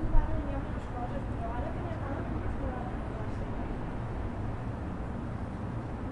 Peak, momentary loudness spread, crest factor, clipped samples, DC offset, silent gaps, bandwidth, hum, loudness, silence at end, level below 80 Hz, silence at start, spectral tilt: -12 dBFS; 2 LU; 22 dB; under 0.1%; under 0.1%; none; 6.2 kHz; none; -36 LUFS; 0 s; -36 dBFS; 0 s; -8.5 dB/octave